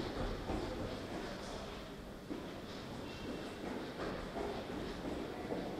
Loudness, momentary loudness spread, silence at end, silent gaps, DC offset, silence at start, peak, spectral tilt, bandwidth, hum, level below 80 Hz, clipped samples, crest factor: -44 LUFS; 5 LU; 0 s; none; under 0.1%; 0 s; -26 dBFS; -5.5 dB/octave; 16 kHz; none; -54 dBFS; under 0.1%; 16 dB